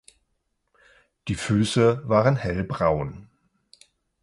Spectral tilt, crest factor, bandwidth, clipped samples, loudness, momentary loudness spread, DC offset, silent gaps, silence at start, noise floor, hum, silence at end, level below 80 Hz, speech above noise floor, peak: -6.5 dB/octave; 20 dB; 11.5 kHz; under 0.1%; -23 LUFS; 12 LU; under 0.1%; none; 1.25 s; -75 dBFS; none; 1 s; -46 dBFS; 52 dB; -6 dBFS